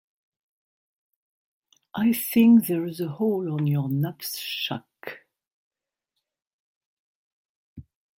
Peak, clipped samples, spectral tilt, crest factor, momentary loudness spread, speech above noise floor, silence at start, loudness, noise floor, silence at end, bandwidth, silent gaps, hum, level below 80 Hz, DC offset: -8 dBFS; under 0.1%; -6 dB/octave; 18 dB; 19 LU; 60 dB; 1.95 s; -23 LUFS; -83 dBFS; 0.35 s; 16.5 kHz; 5.47-5.71 s, 6.47-7.76 s; none; -68 dBFS; under 0.1%